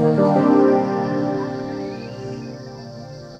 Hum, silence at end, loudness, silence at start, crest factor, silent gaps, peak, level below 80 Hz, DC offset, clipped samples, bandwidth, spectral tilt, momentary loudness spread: none; 0 s; -19 LUFS; 0 s; 16 dB; none; -4 dBFS; -56 dBFS; under 0.1%; under 0.1%; 8 kHz; -8.5 dB/octave; 20 LU